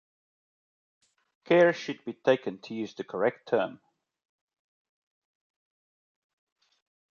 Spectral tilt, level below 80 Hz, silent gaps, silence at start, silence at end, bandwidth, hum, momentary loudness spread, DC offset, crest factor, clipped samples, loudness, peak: -6 dB/octave; -82 dBFS; none; 1.5 s; 3.4 s; 7 kHz; none; 15 LU; under 0.1%; 22 dB; under 0.1%; -28 LUFS; -10 dBFS